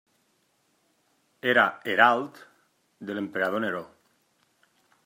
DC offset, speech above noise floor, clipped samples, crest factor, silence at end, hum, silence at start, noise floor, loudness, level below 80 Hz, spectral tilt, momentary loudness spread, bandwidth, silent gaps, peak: under 0.1%; 45 dB; under 0.1%; 24 dB; 1.2 s; none; 1.45 s; -70 dBFS; -25 LUFS; -78 dBFS; -5 dB/octave; 16 LU; 16 kHz; none; -4 dBFS